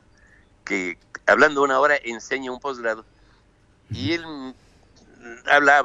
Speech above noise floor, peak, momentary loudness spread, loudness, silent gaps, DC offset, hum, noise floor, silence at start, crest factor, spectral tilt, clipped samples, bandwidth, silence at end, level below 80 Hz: 37 dB; -2 dBFS; 20 LU; -21 LUFS; none; under 0.1%; none; -58 dBFS; 0.65 s; 20 dB; -4 dB/octave; under 0.1%; 9.6 kHz; 0 s; -58 dBFS